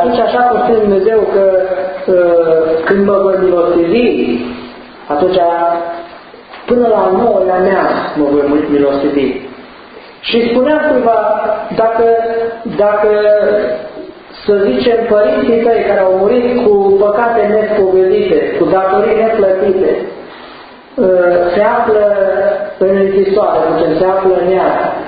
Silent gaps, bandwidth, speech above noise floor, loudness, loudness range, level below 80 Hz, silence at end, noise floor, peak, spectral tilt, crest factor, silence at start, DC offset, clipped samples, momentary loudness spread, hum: none; 5 kHz; 24 dB; -11 LUFS; 3 LU; -44 dBFS; 0 s; -34 dBFS; 0 dBFS; -10.5 dB/octave; 10 dB; 0 s; under 0.1%; under 0.1%; 8 LU; none